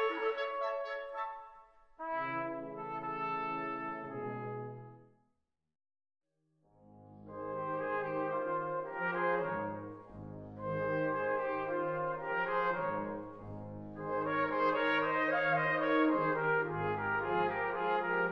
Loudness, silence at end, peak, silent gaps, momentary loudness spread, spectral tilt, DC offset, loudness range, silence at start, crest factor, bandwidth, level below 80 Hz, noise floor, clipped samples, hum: -35 LUFS; 0 s; -18 dBFS; none; 16 LU; -8 dB/octave; under 0.1%; 12 LU; 0 s; 18 dB; 6 kHz; -68 dBFS; -82 dBFS; under 0.1%; none